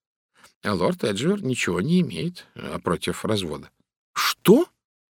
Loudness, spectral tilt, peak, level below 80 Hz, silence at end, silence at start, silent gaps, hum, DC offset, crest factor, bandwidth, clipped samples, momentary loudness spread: -23 LUFS; -5.5 dB/octave; -2 dBFS; -56 dBFS; 0.5 s; 0.65 s; 3.96-4.14 s; none; under 0.1%; 22 dB; 18 kHz; under 0.1%; 15 LU